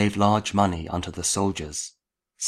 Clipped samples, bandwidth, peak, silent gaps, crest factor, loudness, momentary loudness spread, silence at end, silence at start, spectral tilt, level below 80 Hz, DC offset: under 0.1%; 14 kHz; -4 dBFS; none; 20 dB; -24 LUFS; 11 LU; 0 s; 0 s; -4.5 dB/octave; -48 dBFS; under 0.1%